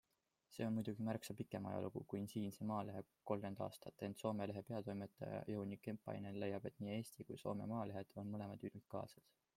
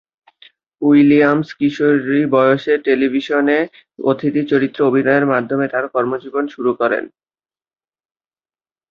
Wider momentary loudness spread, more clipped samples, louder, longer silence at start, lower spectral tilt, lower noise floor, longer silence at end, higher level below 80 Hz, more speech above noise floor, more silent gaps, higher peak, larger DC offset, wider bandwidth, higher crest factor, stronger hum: about the same, 6 LU vs 8 LU; neither; second, -48 LUFS vs -16 LUFS; second, 0.5 s vs 0.8 s; about the same, -7 dB/octave vs -8 dB/octave; second, -80 dBFS vs under -90 dBFS; second, 0.35 s vs 1.85 s; second, -80 dBFS vs -60 dBFS; second, 33 dB vs over 75 dB; neither; second, -26 dBFS vs -2 dBFS; neither; first, 16.5 kHz vs 6.6 kHz; first, 22 dB vs 16 dB; neither